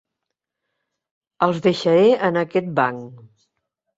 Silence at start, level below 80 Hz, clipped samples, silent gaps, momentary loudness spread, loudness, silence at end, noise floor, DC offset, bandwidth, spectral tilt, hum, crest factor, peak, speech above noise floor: 1.4 s; -66 dBFS; under 0.1%; none; 7 LU; -19 LUFS; 0.8 s; -82 dBFS; under 0.1%; 8 kHz; -6.5 dB/octave; none; 18 dB; -2 dBFS; 63 dB